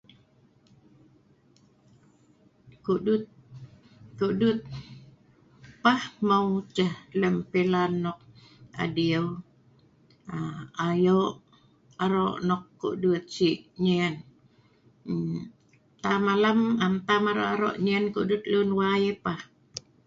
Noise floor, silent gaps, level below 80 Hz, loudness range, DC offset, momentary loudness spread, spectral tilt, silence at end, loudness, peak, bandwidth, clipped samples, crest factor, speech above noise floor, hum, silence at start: -61 dBFS; none; -62 dBFS; 6 LU; under 0.1%; 15 LU; -6.5 dB/octave; 0.25 s; -27 LUFS; -8 dBFS; 7.8 kHz; under 0.1%; 20 dB; 36 dB; none; 2.85 s